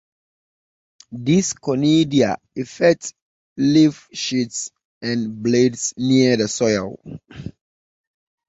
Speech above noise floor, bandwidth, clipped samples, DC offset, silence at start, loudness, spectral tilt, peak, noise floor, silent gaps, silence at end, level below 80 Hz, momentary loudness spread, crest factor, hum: over 71 dB; 8.2 kHz; under 0.1%; under 0.1%; 1.1 s; -19 LUFS; -5 dB/octave; -2 dBFS; under -90 dBFS; 3.22-3.56 s, 4.85-5.01 s; 1 s; -56 dBFS; 20 LU; 18 dB; none